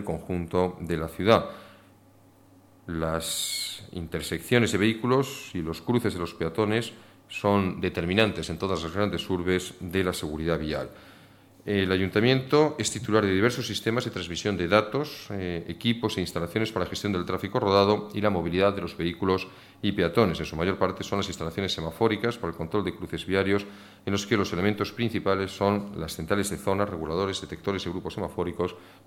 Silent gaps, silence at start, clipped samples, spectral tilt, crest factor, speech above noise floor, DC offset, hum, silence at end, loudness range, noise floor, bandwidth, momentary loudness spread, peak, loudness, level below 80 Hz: none; 0 s; under 0.1%; -5 dB/octave; 22 dB; 29 dB; under 0.1%; none; 0.15 s; 4 LU; -56 dBFS; 17 kHz; 10 LU; -6 dBFS; -27 LUFS; -52 dBFS